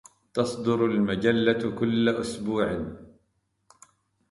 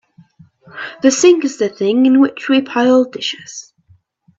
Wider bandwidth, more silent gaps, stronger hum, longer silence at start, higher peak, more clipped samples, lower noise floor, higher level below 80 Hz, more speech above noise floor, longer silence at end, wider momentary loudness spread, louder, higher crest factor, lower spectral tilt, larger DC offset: first, 11.5 kHz vs 8 kHz; neither; neither; second, 0.35 s vs 0.75 s; second, -8 dBFS vs 0 dBFS; neither; first, -73 dBFS vs -53 dBFS; first, -56 dBFS vs -64 dBFS; first, 48 dB vs 39 dB; first, 1.25 s vs 0.8 s; second, 7 LU vs 18 LU; second, -26 LUFS vs -14 LUFS; about the same, 18 dB vs 16 dB; first, -6 dB/octave vs -3.5 dB/octave; neither